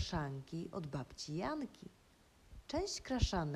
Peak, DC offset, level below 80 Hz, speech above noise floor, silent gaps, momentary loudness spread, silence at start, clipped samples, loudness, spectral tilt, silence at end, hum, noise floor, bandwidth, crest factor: -20 dBFS; under 0.1%; -50 dBFS; 26 dB; none; 21 LU; 0 s; under 0.1%; -42 LUFS; -5 dB/octave; 0 s; none; -66 dBFS; 14 kHz; 22 dB